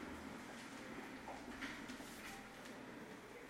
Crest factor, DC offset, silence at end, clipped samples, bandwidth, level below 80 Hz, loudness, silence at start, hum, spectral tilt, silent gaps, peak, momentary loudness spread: 18 dB; under 0.1%; 0 s; under 0.1%; 16.5 kHz; -70 dBFS; -51 LUFS; 0 s; none; -3.5 dB/octave; none; -34 dBFS; 5 LU